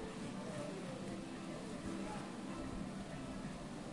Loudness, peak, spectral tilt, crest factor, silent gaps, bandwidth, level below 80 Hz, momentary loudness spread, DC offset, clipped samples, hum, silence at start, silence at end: -46 LUFS; -34 dBFS; -5.5 dB/octave; 12 dB; none; 11.5 kHz; -60 dBFS; 2 LU; under 0.1%; under 0.1%; none; 0 s; 0 s